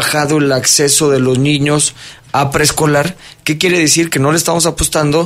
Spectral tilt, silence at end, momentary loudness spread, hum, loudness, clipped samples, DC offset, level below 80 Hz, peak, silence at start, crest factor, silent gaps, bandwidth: -3.5 dB/octave; 0 s; 6 LU; none; -12 LUFS; under 0.1%; under 0.1%; -36 dBFS; 0 dBFS; 0 s; 12 dB; none; 16 kHz